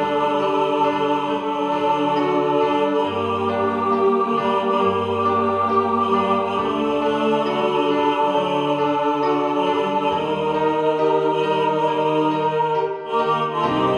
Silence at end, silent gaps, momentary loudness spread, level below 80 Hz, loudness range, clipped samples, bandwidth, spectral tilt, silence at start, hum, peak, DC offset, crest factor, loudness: 0 s; none; 3 LU; -58 dBFS; 1 LU; under 0.1%; 10 kHz; -6.5 dB/octave; 0 s; none; -6 dBFS; under 0.1%; 14 dB; -20 LUFS